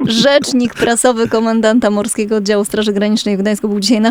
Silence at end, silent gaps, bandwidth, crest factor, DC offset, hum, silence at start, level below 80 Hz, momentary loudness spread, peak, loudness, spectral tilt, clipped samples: 0 s; none; 16.5 kHz; 12 dB; under 0.1%; none; 0 s; -48 dBFS; 5 LU; 0 dBFS; -13 LUFS; -4 dB/octave; under 0.1%